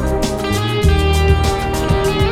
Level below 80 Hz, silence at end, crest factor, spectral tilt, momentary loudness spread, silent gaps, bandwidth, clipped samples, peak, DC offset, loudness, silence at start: -20 dBFS; 0 s; 14 dB; -5.5 dB/octave; 5 LU; none; 15.5 kHz; under 0.1%; -2 dBFS; under 0.1%; -16 LUFS; 0 s